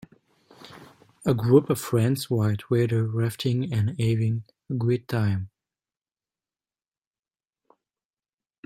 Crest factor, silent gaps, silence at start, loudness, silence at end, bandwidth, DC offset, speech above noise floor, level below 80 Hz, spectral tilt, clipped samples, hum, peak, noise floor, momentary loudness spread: 20 dB; none; 0.6 s; -25 LUFS; 3.2 s; 16 kHz; under 0.1%; over 67 dB; -62 dBFS; -7 dB/octave; under 0.1%; none; -6 dBFS; under -90 dBFS; 11 LU